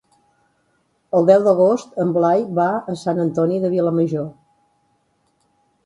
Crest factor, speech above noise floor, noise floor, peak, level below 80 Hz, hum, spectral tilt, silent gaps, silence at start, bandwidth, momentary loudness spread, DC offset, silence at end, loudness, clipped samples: 20 dB; 48 dB; -65 dBFS; 0 dBFS; -64 dBFS; none; -8 dB/octave; none; 1.15 s; 11 kHz; 9 LU; under 0.1%; 1.55 s; -18 LUFS; under 0.1%